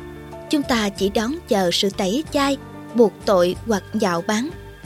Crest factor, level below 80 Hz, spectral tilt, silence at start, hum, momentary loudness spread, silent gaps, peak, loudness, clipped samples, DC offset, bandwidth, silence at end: 18 dB; -46 dBFS; -4.5 dB/octave; 0 s; none; 8 LU; none; -4 dBFS; -21 LUFS; under 0.1%; under 0.1%; 16 kHz; 0.05 s